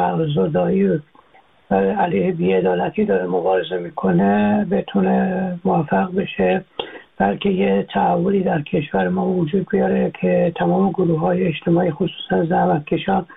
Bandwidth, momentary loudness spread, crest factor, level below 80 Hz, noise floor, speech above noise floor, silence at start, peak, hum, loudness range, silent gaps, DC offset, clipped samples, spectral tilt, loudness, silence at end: 4 kHz; 4 LU; 14 dB; -50 dBFS; -52 dBFS; 34 dB; 0 s; -4 dBFS; none; 1 LU; none; under 0.1%; under 0.1%; -11 dB/octave; -19 LUFS; 0 s